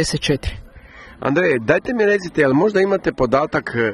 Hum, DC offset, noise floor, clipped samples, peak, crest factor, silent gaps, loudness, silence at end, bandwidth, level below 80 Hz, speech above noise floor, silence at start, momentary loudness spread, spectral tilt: none; under 0.1%; -41 dBFS; under 0.1%; -2 dBFS; 16 dB; none; -18 LUFS; 0 s; 12 kHz; -38 dBFS; 24 dB; 0 s; 7 LU; -5.5 dB/octave